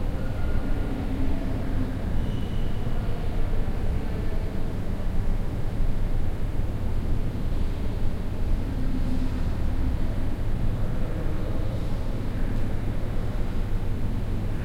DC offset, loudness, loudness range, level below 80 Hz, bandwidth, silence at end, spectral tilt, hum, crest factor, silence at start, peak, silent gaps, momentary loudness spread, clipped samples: under 0.1%; -31 LUFS; 1 LU; -26 dBFS; 5.6 kHz; 0 s; -8 dB/octave; none; 12 dB; 0 s; -12 dBFS; none; 2 LU; under 0.1%